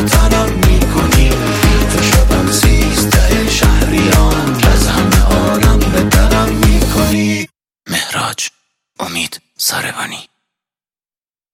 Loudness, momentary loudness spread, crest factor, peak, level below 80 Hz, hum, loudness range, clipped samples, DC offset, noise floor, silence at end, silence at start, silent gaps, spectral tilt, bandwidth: -12 LUFS; 9 LU; 12 dB; 0 dBFS; -16 dBFS; none; 8 LU; under 0.1%; under 0.1%; under -90 dBFS; 1.3 s; 0 s; none; -4.5 dB/octave; 17 kHz